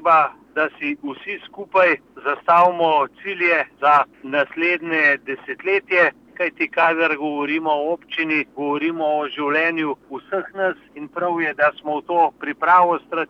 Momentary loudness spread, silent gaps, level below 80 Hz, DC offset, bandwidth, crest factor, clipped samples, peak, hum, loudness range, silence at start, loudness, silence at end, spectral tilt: 11 LU; none; -68 dBFS; under 0.1%; 7.6 kHz; 16 dB; under 0.1%; -4 dBFS; none; 4 LU; 0 s; -19 LUFS; 0.05 s; -6 dB/octave